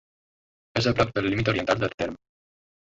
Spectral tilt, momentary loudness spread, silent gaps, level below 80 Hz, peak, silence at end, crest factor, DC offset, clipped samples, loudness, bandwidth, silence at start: -6 dB/octave; 9 LU; 1.94-1.98 s; -48 dBFS; -6 dBFS; 0.8 s; 20 dB; under 0.1%; under 0.1%; -25 LUFS; 8 kHz; 0.75 s